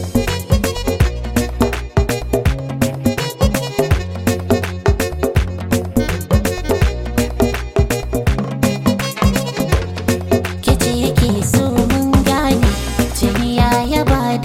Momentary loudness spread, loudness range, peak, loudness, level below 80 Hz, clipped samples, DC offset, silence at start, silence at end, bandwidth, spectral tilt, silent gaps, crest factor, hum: 5 LU; 3 LU; 0 dBFS; -17 LUFS; -24 dBFS; under 0.1%; under 0.1%; 0 s; 0 s; 16.5 kHz; -5.5 dB/octave; none; 14 dB; none